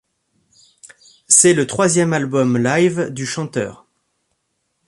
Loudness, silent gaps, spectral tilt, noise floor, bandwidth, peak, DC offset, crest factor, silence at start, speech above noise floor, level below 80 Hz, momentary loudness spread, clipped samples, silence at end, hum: -15 LUFS; none; -4 dB/octave; -71 dBFS; 11.5 kHz; 0 dBFS; under 0.1%; 18 dB; 0.85 s; 55 dB; -58 dBFS; 13 LU; under 0.1%; 1.15 s; none